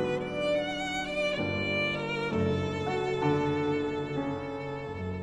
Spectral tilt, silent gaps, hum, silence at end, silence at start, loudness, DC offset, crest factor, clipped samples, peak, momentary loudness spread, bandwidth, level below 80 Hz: -6 dB/octave; none; none; 0 s; 0 s; -30 LUFS; under 0.1%; 16 dB; under 0.1%; -16 dBFS; 7 LU; 11 kHz; -54 dBFS